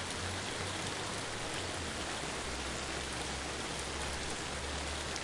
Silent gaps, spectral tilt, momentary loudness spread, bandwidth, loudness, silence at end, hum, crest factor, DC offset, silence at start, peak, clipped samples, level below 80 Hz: none; -2.5 dB/octave; 1 LU; 11.5 kHz; -38 LUFS; 0 s; none; 18 dB; under 0.1%; 0 s; -22 dBFS; under 0.1%; -50 dBFS